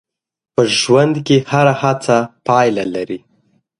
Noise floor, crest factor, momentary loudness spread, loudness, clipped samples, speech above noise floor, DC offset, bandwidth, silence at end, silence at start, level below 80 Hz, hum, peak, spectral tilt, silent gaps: -59 dBFS; 16 dB; 10 LU; -14 LUFS; under 0.1%; 45 dB; under 0.1%; 11.5 kHz; 0.6 s; 0.6 s; -58 dBFS; none; 0 dBFS; -5 dB/octave; none